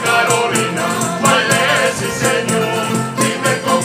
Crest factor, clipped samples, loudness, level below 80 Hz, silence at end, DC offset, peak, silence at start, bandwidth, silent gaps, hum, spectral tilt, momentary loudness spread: 16 dB; under 0.1%; -15 LUFS; -52 dBFS; 0 s; under 0.1%; 0 dBFS; 0 s; 16 kHz; none; none; -3 dB/octave; 5 LU